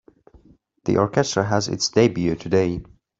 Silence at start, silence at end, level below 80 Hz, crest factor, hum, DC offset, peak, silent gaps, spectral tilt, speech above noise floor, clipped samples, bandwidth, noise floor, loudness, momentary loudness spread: 0.85 s; 0.35 s; -50 dBFS; 18 dB; none; under 0.1%; -4 dBFS; none; -5 dB/octave; 35 dB; under 0.1%; 8 kHz; -55 dBFS; -21 LUFS; 7 LU